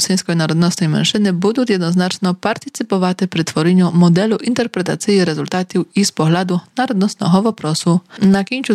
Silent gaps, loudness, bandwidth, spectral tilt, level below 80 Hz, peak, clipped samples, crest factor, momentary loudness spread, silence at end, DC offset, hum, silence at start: none; -16 LUFS; 13.5 kHz; -5.5 dB/octave; -58 dBFS; -4 dBFS; under 0.1%; 12 dB; 6 LU; 0 s; under 0.1%; none; 0 s